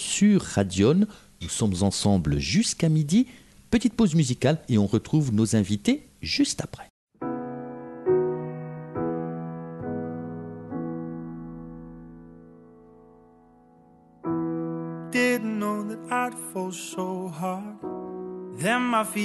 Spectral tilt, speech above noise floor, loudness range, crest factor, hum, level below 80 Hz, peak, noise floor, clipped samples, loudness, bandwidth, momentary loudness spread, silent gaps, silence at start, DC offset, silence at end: -5.5 dB/octave; 32 dB; 14 LU; 18 dB; none; -50 dBFS; -8 dBFS; -55 dBFS; under 0.1%; -26 LUFS; 12 kHz; 15 LU; 6.90-7.07 s; 0 s; under 0.1%; 0 s